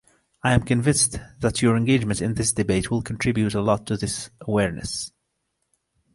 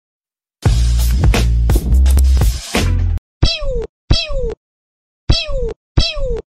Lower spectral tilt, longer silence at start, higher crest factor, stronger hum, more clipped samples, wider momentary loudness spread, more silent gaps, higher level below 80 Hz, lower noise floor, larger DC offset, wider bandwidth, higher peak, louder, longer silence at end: about the same, -4.5 dB/octave vs -5 dB/octave; second, 0.45 s vs 0.6 s; first, 20 dB vs 14 dB; neither; neither; about the same, 9 LU vs 11 LU; second, none vs 3.18-3.41 s, 3.89-4.08 s, 4.57-5.27 s, 5.76-5.95 s; second, -42 dBFS vs -16 dBFS; second, -75 dBFS vs under -90 dBFS; neither; second, 11.5 kHz vs 15.5 kHz; about the same, -4 dBFS vs -2 dBFS; second, -23 LUFS vs -16 LUFS; first, 1.05 s vs 0.15 s